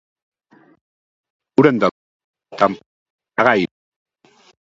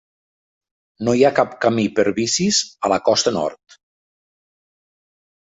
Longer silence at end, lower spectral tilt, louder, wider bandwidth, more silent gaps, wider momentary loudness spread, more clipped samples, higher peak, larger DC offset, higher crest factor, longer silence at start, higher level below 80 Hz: second, 1.1 s vs 1.85 s; first, -7 dB/octave vs -3.5 dB/octave; about the same, -17 LUFS vs -18 LUFS; about the same, 7.8 kHz vs 8 kHz; first, 1.91-2.34 s, 2.86-3.19 s vs none; first, 13 LU vs 6 LU; neither; about the same, 0 dBFS vs -2 dBFS; neither; about the same, 22 dB vs 18 dB; first, 1.6 s vs 1 s; about the same, -62 dBFS vs -58 dBFS